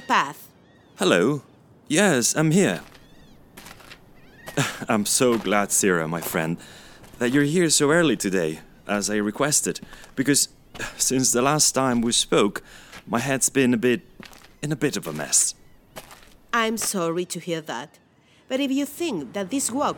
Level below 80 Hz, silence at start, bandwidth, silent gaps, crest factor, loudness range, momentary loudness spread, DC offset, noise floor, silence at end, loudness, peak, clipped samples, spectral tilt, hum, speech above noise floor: -54 dBFS; 0 s; 19 kHz; none; 22 dB; 4 LU; 15 LU; under 0.1%; -49 dBFS; 0 s; -22 LUFS; -2 dBFS; under 0.1%; -3.5 dB/octave; none; 27 dB